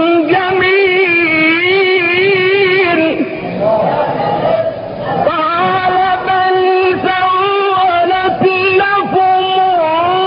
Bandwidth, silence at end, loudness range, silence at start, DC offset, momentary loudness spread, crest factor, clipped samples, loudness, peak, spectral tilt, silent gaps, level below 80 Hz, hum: 5.4 kHz; 0 s; 3 LU; 0 s; under 0.1%; 5 LU; 12 dB; under 0.1%; -11 LUFS; 0 dBFS; -2 dB/octave; none; -48 dBFS; none